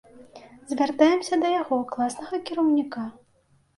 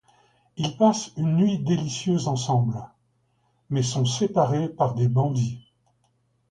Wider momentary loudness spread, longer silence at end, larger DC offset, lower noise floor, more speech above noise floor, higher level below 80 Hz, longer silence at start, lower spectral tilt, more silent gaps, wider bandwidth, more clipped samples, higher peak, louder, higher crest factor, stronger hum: first, 13 LU vs 9 LU; second, 0.65 s vs 0.9 s; neither; second, -63 dBFS vs -68 dBFS; second, 39 dB vs 45 dB; second, -68 dBFS vs -60 dBFS; second, 0.15 s vs 0.55 s; second, -4 dB/octave vs -6.5 dB/octave; neither; about the same, 11.5 kHz vs 10.5 kHz; neither; about the same, -6 dBFS vs -6 dBFS; about the same, -24 LUFS vs -24 LUFS; about the same, 20 dB vs 18 dB; neither